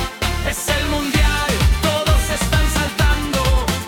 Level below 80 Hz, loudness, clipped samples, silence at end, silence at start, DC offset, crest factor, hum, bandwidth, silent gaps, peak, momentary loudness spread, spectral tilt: -20 dBFS; -18 LUFS; under 0.1%; 0 s; 0 s; under 0.1%; 14 dB; none; 18 kHz; none; -4 dBFS; 3 LU; -4 dB/octave